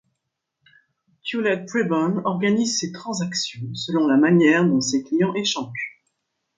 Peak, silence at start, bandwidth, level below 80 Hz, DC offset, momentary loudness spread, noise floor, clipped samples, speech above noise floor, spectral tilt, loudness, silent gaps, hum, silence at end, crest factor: -6 dBFS; 1.25 s; 9.4 kHz; -66 dBFS; under 0.1%; 13 LU; -79 dBFS; under 0.1%; 58 dB; -4.5 dB/octave; -21 LUFS; none; none; 0.7 s; 16 dB